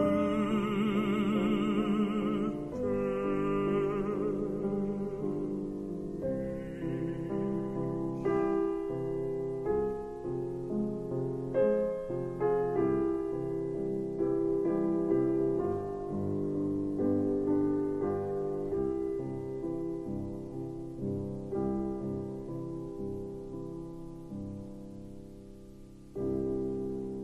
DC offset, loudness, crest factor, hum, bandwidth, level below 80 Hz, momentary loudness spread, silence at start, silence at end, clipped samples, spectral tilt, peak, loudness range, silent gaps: under 0.1%; -33 LUFS; 16 dB; none; 12 kHz; -54 dBFS; 11 LU; 0 s; 0 s; under 0.1%; -8.5 dB/octave; -16 dBFS; 8 LU; none